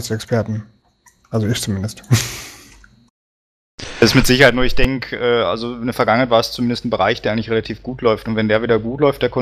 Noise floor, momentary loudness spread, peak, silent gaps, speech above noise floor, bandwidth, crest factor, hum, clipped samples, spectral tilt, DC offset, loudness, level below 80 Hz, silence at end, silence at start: -54 dBFS; 13 LU; 0 dBFS; 3.10-3.78 s; 38 dB; 15 kHz; 18 dB; none; under 0.1%; -5 dB/octave; under 0.1%; -17 LUFS; -32 dBFS; 0 s; 0 s